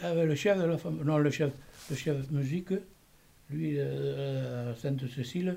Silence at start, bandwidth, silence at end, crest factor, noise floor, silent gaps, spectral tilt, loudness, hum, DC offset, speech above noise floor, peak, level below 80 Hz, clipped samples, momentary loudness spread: 0 s; 16 kHz; 0 s; 16 dB; -61 dBFS; none; -7 dB/octave; -32 LUFS; none; under 0.1%; 30 dB; -16 dBFS; -62 dBFS; under 0.1%; 9 LU